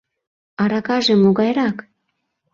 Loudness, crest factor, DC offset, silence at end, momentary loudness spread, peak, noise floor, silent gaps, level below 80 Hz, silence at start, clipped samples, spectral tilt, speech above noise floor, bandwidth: -17 LUFS; 16 dB; under 0.1%; 0.75 s; 9 LU; -4 dBFS; -73 dBFS; none; -60 dBFS; 0.6 s; under 0.1%; -6 dB/octave; 57 dB; 7.2 kHz